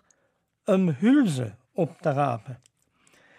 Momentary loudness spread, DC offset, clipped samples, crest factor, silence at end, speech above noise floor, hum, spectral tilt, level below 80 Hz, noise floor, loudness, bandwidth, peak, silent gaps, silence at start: 15 LU; under 0.1%; under 0.1%; 16 dB; 0.8 s; 49 dB; none; -7.5 dB/octave; -74 dBFS; -72 dBFS; -25 LUFS; 12.5 kHz; -10 dBFS; none; 0.7 s